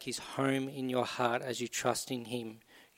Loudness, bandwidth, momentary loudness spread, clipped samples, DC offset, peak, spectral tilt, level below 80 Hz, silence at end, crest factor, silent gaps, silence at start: -34 LUFS; 16.5 kHz; 7 LU; under 0.1%; under 0.1%; -16 dBFS; -4 dB/octave; -74 dBFS; 0.15 s; 20 dB; none; 0 s